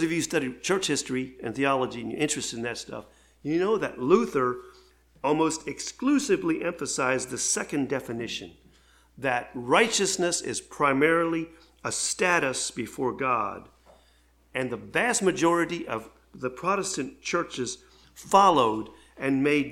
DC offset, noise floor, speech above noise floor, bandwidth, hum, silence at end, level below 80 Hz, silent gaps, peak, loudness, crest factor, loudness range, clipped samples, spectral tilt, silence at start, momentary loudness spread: under 0.1%; -61 dBFS; 35 dB; 16 kHz; none; 0 s; -60 dBFS; none; -4 dBFS; -26 LUFS; 22 dB; 3 LU; under 0.1%; -3.5 dB/octave; 0 s; 12 LU